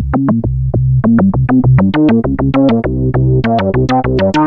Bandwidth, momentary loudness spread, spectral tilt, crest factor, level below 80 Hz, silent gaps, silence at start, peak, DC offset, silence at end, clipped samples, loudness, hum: 6.4 kHz; 4 LU; -9.5 dB/octave; 10 dB; -24 dBFS; none; 0 s; 0 dBFS; under 0.1%; 0 s; under 0.1%; -12 LUFS; none